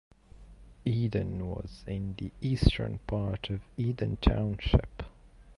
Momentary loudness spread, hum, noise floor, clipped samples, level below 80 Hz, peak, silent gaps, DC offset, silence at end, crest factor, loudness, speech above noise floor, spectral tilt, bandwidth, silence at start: 11 LU; none; -54 dBFS; under 0.1%; -38 dBFS; -8 dBFS; none; under 0.1%; 0.05 s; 24 dB; -32 LUFS; 25 dB; -8 dB/octave; 11.5 kHz; 0.4 s